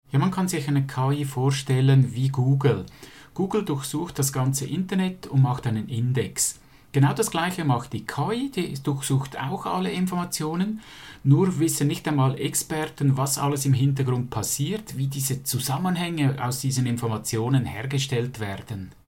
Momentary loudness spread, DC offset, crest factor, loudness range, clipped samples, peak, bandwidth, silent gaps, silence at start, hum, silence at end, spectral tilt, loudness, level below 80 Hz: 8 LU; 0.1%; 18 dB; 3 LU; under 0.1%; -6 dBFS; 17 kHz; none; 0.15 s; none; 0.15 s; -5.5 dB/octave; -25 LUFS; -56 dBFS